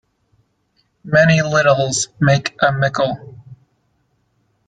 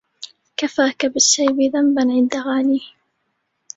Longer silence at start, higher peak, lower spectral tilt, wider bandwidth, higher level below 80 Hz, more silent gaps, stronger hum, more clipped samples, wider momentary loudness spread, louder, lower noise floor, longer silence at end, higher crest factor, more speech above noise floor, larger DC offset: first, 1.05 s vs 0.2 s; about the same, -2 dBFS vs -2 dBFS; first, -4.5 dB/octave vs -1 dB/octave; first, 9.4 kHz vs 8 kHz; first, -52 dBFS vs -64 dBFS; neither; neither; neither; second, 7 LU vs 13 LU; about the same, -15 LUFS vs -17 LUFS; second, -64 dBFS vs -71 dBFS; first, 1.15 s vs 0.9 s; about the same, 16 dB vs 18 dB; second, 49 dB vs 54 dB; neither